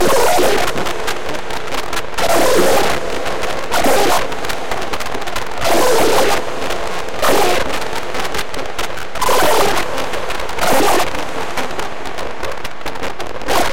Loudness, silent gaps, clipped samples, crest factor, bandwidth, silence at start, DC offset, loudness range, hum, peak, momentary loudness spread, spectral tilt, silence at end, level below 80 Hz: -17 LUFS; none; under 0.1%; 16 dB; 17 kHz; 0 s; 10%; 3 LU; none; -2 dBFS; 12 LU; -3 dB/octave; 0 s; -36 dBFS